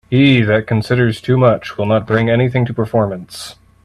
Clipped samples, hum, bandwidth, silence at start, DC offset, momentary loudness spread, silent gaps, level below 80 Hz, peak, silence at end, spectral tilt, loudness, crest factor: under 0.1%; none; 12.5 kHz; 0.1 s; under 0.1%; 13 LU; none; -46 dBFS; 0 dBFS; 0.35 s; -7.5 dB/octave; -14 LUFS; 14 dB